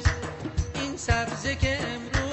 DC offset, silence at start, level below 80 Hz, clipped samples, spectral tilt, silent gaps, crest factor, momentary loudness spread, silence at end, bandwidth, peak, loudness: under 0.1%; 0 s; -34 dBFS; under 0.1%; -4.5 dB/octave; none; 16 dB; 6 LU; 0 s; 8.4 kHz; -10 dBFS; -28 LUFS